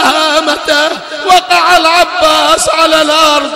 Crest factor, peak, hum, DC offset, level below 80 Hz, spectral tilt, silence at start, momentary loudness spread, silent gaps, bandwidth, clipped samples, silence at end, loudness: 8 dB; 0 dBFS; none; 0.5%; -40 dBFS; -1 dB/octave; 0 s; 4 LU; none; 16.5 kHz; 0.2%; 0 s; -8 LUFS